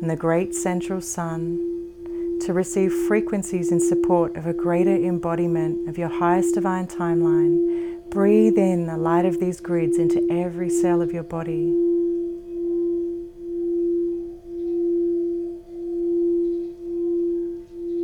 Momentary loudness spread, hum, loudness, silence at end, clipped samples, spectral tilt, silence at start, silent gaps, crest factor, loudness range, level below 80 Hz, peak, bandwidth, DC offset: 10 LU; none; -22 LUFS; 0 s; under 0.1%; -7 dB/octave; 0 s; none; 16 dB; 5 LU; -52 dBFS; -6 dBFS; 15.5 kHz; under 0.1%